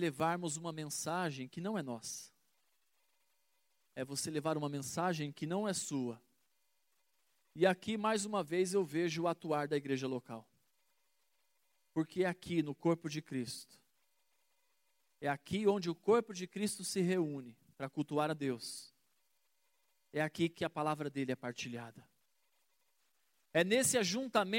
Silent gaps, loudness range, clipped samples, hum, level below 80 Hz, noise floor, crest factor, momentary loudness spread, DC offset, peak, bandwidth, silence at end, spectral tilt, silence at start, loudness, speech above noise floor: none; 6 LU; under 0.1%; none; -80 dBFS; -82 dBFS; 22 dB; 12 LU; under 0.1%; -16 dBFS; 16.5 kHz; 0 s; -4.5 dB/octave; 0 s; -37 LUFS; 45 dB